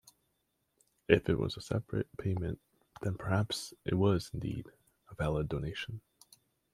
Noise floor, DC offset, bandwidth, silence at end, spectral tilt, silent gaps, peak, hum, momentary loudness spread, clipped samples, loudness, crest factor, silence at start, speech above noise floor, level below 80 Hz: -80 dBFS; under 0.1%; 15 kHz; 0.75 s; -6.5 dB/octave; none; -8 dBFS; none; 12 LU; under 0.1%; -34 LUFS; 26 dB; 1.1 s; 47 dB; -54 dBFS